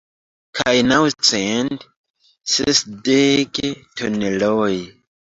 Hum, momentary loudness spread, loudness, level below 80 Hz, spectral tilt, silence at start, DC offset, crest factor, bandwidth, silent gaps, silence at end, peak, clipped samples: none; 12 LU; -18 LUFS; -52 dBFS; -3 dB/octave; 0.55 s; under 0.1%; 20 dB; 8 kHz; 1.97-2.04 s, 2.10-2.14 s; 0.35 s; 0 dBFS; under 0.1%